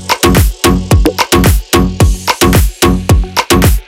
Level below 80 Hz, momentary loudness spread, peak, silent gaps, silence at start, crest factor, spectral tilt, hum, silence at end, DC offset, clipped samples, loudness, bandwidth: -14 dBFS; 3 LU; 0 dBFS; none; 0 s; 8 dB; -4.5 dB/octave; none; 0.05 s; under 0.1%; under 0.1%; -10 LUFS; 19 kHz